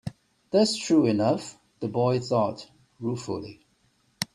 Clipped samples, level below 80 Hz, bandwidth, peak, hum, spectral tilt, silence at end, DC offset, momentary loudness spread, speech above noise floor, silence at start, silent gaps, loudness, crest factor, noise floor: under 0.1%; -64 dBFS; 14 kHz; -8 dBFS; none; -5.5 dB/octave; 0.1 s; under 0.1%; 17 LU; 42 dB; 0.05 s; none; -26 LUFS; 20 dB; -67 dBFS